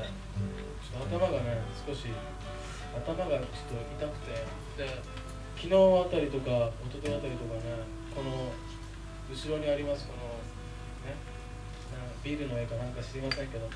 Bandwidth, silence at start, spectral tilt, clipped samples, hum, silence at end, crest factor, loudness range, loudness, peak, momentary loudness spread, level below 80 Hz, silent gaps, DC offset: 11 kHz; 0 s; -6.5 dB/octave; under 0.1%; 50 Hz at -45 dBFS; 0 s; 20 dB; 8 LU; -34 LUFS; -14 dBFS; 13 LU; -44 dBFS; none; under 0.1%